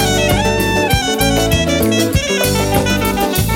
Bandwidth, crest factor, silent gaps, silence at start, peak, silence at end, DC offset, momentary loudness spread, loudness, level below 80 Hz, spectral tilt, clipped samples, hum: 17 kHz; 14 dB; none; 0 s; 0 dBFS; 0 s; under 0.1%; 2 LU; -14 LUFS; -26 dBFS; -4 dB/octave; under 0.1%; none